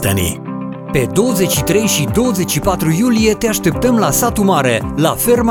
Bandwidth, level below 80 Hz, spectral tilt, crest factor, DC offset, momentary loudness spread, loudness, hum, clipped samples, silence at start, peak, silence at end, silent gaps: 19.5 kHz; -34 dBFS; -4.5 dB/octave; 14 dB; under 0.1%; 5 LU; -14 LUFS; none; under 0.1%; 0 s; 0 dBFS; 0 s; none